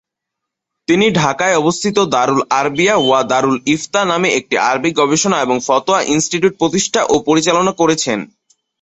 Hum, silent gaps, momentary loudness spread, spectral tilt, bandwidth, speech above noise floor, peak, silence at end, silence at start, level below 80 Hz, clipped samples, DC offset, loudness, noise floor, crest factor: none; none; 3 LU; -3.5 dB/octave; 8.4 kHz; 66 dB; 0 dBFS; 0.55 s; 0.9 s; -52 dBFS; under 0.1%; under 0.1%; -14 LUFS; -79 dBFS; 14 dB